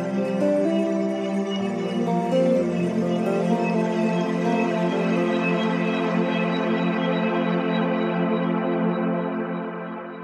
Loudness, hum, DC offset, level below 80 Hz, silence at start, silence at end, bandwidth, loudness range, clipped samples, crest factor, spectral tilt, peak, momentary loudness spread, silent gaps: -23 LUFS; none; under 0.1%; -70 dBFS; 0 s; 0 s; 9.8 kHz; 1 LU; under 0.1%; 12 dB; -7.5 dB/octave; -10 dBFS; 4 LU; none